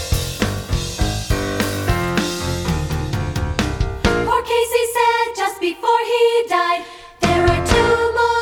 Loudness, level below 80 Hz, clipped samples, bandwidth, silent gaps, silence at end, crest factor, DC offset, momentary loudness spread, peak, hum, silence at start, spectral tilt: -18 LUFS; -28 dBFS; under 0.1%; over 20 kHz; none; 0 s; 18 dB; under 0.1%; 7 LU; 0 dBFS; none; 0 s; -5 dB/octave